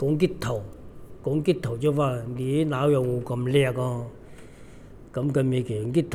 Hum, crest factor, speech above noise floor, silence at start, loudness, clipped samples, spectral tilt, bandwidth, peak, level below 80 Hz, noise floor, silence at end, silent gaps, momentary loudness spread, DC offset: none; 18 dB; 20 dB; 0 s; -26 LUFS; under 0.1%; -7.5 dB/octave; 15 kHz; -8 dBFS; -50 dBFS; -45 dBFS; 0 s; none; 11 LU; under 0.1%